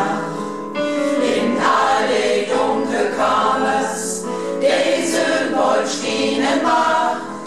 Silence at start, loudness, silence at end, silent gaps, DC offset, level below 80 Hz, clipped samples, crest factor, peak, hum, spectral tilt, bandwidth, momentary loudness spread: 0 s; -18 LUFS; 0 s; none; 0.6%; -62 dBFS; under 0.1%; 14 dB; -4 dBFS; none; -3 dB/octave; 13.5 kHz; 7 LU